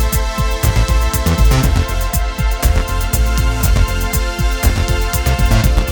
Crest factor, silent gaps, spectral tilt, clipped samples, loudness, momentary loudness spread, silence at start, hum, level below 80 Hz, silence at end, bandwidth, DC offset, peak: 12 dB; none; -4.5 dB/octave; under 0.1%; -16 LUFS; 4 LU; 0 s; none; -16 dBFS; 0 s; 19.5 kHz; under 0.1%; 0 dBFS